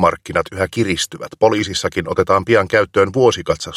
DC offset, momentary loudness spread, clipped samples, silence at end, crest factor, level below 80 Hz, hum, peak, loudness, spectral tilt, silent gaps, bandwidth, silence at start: under 0.1%; 7 LU; under 0.1%; 0 s; 16 dB; -44 dBFS; none; 0 dBFS; -17 LUFS; -4.5 dB/octave; none; 14.5 kHz; 0 s